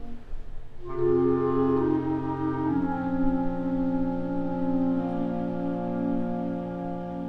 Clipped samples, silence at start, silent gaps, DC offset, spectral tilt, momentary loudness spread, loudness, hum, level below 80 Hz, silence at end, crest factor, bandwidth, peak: under 0.1%; 0 s; none; under 0.1%; -10.5 dB/octave; 10 LU; -27 LUFS; none; -42 dBFS; 0 s; 14 dB; 4.9 kHz; -12 dBFS